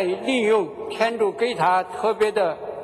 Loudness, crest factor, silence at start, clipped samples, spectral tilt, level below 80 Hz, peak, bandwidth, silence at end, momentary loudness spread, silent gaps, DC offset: -22 LUFS; 16 dB; 0 s; under 0.1%; -4.5 dB/octave; -64 dBFS; -6 dBFS; 12.5 kHz; 0 s; 5 LU; none; under 0.1%